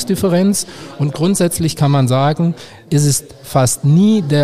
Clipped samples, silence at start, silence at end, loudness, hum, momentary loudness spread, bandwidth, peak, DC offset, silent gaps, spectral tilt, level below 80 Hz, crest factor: under 0.1%; 0 s; 0 s; -15 LUFS; none; 8 LU; 15.5 kHz; 0 dBFS; 0.9%; none; -5.5 dB/octave; -46 dBFS; 12 dB